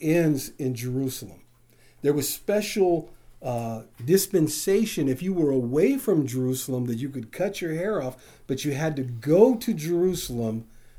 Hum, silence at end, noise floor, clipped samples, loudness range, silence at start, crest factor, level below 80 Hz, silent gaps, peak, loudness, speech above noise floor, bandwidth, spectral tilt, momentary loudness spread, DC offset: none; 0 s; -56 dBFS; under 0.1%; 4 LU; 0 s; 20 dB; -54 dBFS; none; -4 dBFS; -25 LUFS; 32 dB; over 20 kHz; -5.5 dB/octave; 10 LU; under 0.1%